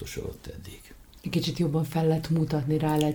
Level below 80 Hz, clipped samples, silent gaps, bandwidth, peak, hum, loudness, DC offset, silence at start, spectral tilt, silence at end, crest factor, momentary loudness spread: -48 dBFS; under 0.1%; none; 19.5 kHz; -12 dBFS; none; -27 LUFS; under 0.1%; 0 s; -7 dB/octave; 0 s; 16 dB; 17 LU